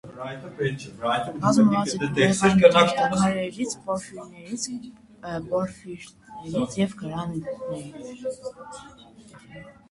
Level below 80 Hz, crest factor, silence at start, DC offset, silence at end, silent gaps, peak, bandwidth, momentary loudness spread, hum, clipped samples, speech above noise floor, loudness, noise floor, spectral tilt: -56 dBFS; 24 dB; 0.05 s; under 0.1%; 0.2 s; none; -2 dBFS; 11.5 kHz; 22 LU; none; under 0.1%; 22 dB; -24 LUFS; -46 dBFS; -5 dB/octave